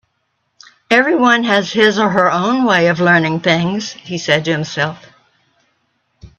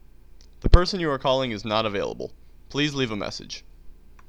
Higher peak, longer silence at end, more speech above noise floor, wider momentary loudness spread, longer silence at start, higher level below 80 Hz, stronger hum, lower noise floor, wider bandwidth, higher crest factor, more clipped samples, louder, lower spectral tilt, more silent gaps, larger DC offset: about the same, 0 dBFS vs 0 dBFS; second, 0.1 s vs 0.35 s; first, 53 dB vs 23 dB; second, 9 LU vs 16 LU; first, 0.9 s vs 0.65 s; second, -56 dBFS vs -28 dBFS; neither; first, -67 dBFS vs -49 dBFS; about the same, 9 kHz vs 9.2 kHz; second, 16 dB vs 24 dB; neither; first, -14 LUFS vs -25 LUFS; about the same, -5 dB/octave vs -5.5 dB/octave; neither; second, under 0.1% vs 0.3%